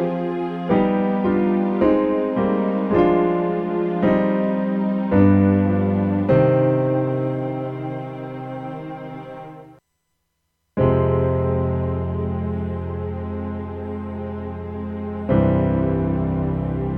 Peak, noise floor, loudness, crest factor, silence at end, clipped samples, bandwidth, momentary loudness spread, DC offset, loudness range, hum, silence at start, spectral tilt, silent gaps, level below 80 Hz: -2 dBFS; -73 dBFS; -21 LUFS; 18 dB; 0 s; under 0.1%; 4.6 kHz; 14 LU; under 0.1%; 9 LU; none; 0 s; -11 dB/octave; none; -40 dBFS